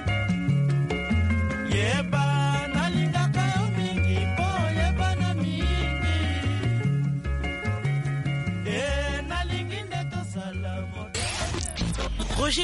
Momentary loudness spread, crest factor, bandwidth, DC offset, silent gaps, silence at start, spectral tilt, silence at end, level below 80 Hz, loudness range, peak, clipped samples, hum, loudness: 7 LU; 12 dB; 11.5 kHz; under 0.1%; none; 0 s; -5.5 dB/octave; 0 s; -34 dBFS; 5 LU; -12 dBFS; under 0.1%; none; -26 LUFS